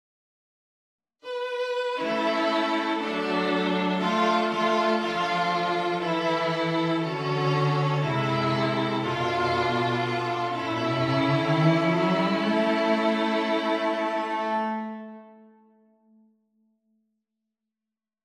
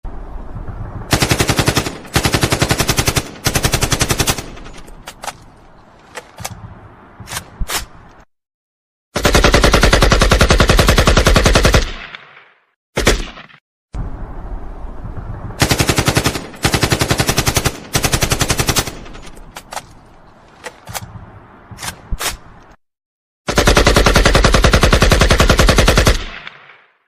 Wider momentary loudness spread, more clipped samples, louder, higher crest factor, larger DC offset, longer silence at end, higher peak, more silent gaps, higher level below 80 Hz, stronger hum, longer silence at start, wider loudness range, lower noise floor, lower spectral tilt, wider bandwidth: second, 5 LU vs 22 LU; neither; second, -25 LUFS vs -14 LUFS; about the same, 16 dB vs 16 dB; neither; first, 2.9 s vs 0.6 s; second, -10 dBFS vs 0 dBFS; second, none vs 8.54-9.12 s, 12.76-12.93 s, 13.61-13.88 s, 23.06-23.45 s; second, -68 dBFS vs -20 dBFS; neither; first, 1.25 s vs 0.05 s; second, 6 LU vs 17 LU; first, -89 dBFS vs -45 dBFS; first, -6.5 dB/octave vs -3.5 dB/octave; second, 12 kHz vs 16 kHz